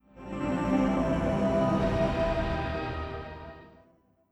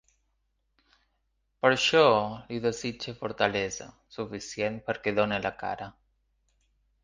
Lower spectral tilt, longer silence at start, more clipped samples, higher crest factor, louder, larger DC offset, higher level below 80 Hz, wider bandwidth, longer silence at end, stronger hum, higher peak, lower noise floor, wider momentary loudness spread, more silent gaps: first, -7.5 dB/octave vs -4 dB/octave; second, 0.15 s vs 1.65 s; neither; second, 14 dB vs 24 dB; about the same, -29 LUFS vs -28 LUFS; neither; first, -40 dBFS vs -60 dBFS; first, 11.5 kHz vs 9.8 kHz; second, 0.6 s vs 1.1 s; neither; second, -14 dBFS vs -6 dBFS; second, -64 dBFS vs -75 dBFS; second, 14 LU vs 17 LU; neither